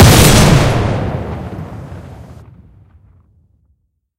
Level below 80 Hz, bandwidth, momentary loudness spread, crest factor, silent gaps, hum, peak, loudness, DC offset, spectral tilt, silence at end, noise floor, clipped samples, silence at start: -22 dBFS; over 20 kHz; 25 LU; 14 dB; none; none; 0 dBFS; -11 LUFS; under 0.1%; -4.5 dB/octave; 1.85 s; -61 dBFS; 0.7%; 0 s